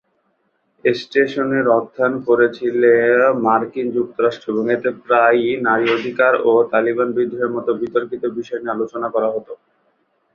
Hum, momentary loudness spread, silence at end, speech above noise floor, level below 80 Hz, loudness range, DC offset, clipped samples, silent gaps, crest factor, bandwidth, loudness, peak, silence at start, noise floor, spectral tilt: none; 9 LU; 0.8 s; 49 dB; -62 dBFS; 4 LU; under 0.1%; under 0.1%; none; 16 dB; 6.8 kHz; -17 LUFS; -2 dBFS; 0.85 s; -66 dBFS; -7 dB/octave